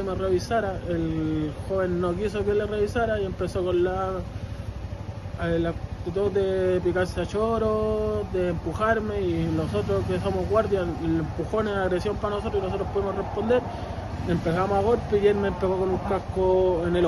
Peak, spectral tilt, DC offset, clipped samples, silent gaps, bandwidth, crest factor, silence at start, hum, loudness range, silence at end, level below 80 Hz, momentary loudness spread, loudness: -8 dBFS; -7.5 dB/octave; under 0.1%; under 0.1%; none; 12 kHz; 16 dB; 0 s; none; 3 LU; 0 s; -40 dBFS; 7 LU; -26 LUFS